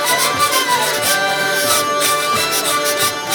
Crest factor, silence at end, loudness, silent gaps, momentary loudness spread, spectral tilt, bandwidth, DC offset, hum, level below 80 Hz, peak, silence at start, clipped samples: 14 dB; 0 s; -14 LUFS; none; 2 LU; -0.5 dB/octave; 19.5 kHz; under 0.1%; none; -56 dBFS; -2 dBFS; 0 s; under 0.1%